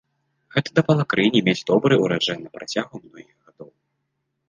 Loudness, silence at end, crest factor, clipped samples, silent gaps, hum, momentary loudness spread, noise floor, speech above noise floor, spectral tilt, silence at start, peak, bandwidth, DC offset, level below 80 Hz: -20 LUFS; 0.85 s; 20 dB; under 0.1%; none; none; 11 LU; -76 dBFS; 55 dB; -6 dB/octave; 0.55 s; -4 dBFS; 9.6 kHz; under 0.1%; -62 dBFS